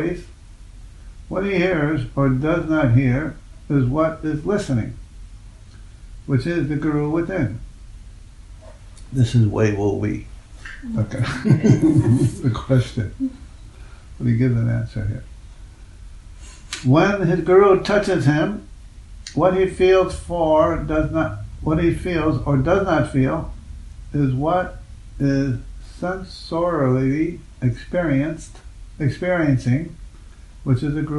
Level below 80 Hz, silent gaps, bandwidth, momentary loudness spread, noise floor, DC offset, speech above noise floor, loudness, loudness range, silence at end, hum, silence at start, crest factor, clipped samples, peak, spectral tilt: -38 dBFS; none; 11.5 kHz; 15 LU; -41 dBFS; under 0.1%; 22 dB; -20 LUFS; 6 LU; 0 s; none; 0 s; 20 dB; under 0.1%; -2 dBFS; -7.5 dB/octave